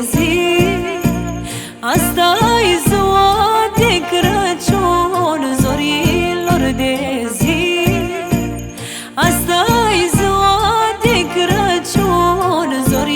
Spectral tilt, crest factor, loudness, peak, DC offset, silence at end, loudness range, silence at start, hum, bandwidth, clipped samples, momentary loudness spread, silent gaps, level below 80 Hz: -4.5 dB/octave; 14 dB; -14 LUFS; 0 dBFS; under 0.1%; 0 s; 3 LU; 0 s; none; over 20 kHz; under 0.1%; 7 LU; none; -32 dBFS